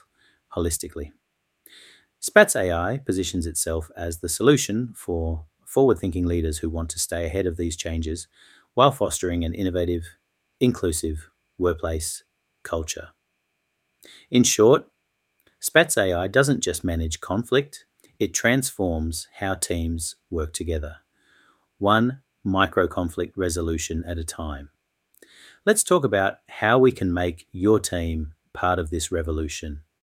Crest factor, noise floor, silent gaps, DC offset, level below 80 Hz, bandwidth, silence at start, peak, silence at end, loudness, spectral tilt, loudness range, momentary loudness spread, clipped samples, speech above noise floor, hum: 24 dB; -75 dBFS; none; under 0.1%; -40 dBFS; 17 kHz; 0.5 s; -2 dBFS; 0.2 s; -23 LUFS; -4.5 dB/octave; 5 LU; 13 LU; under 0.1%; 52 dB; none